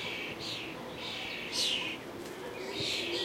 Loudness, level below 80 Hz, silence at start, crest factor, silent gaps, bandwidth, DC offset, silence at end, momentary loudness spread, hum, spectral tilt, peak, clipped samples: -35 LUFS; -66 dBFS; 0 s; 18 dB; none; 16 kHz; under 0.1%; 0 s; 11 LU; none; -2 dB/octave; -20 dBFS; under 0.1%